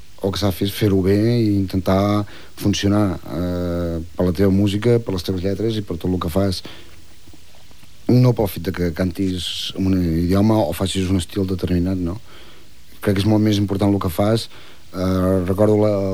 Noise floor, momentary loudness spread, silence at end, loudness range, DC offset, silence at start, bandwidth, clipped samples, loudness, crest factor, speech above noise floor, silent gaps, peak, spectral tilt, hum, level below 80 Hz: -47 dBFS; 8 LU; 0 s; 3 LU; 2%; 0.2 s; 19.5 kHz; under 0.1%; -19 LUFS; 16 dB; 29 dB; none; -4 dBFS; -7 dB/octave; none; -42 dBFS